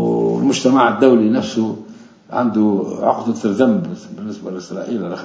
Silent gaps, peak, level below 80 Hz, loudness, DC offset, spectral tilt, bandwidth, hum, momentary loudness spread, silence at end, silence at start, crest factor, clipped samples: none; 0 dBFS; -58 dBFS; -16 LUFS; under 0.1%; -6 dB/octave; 8 kHz; none; 16 LU; 0 s; 0 s; 16 dB; under 0.1%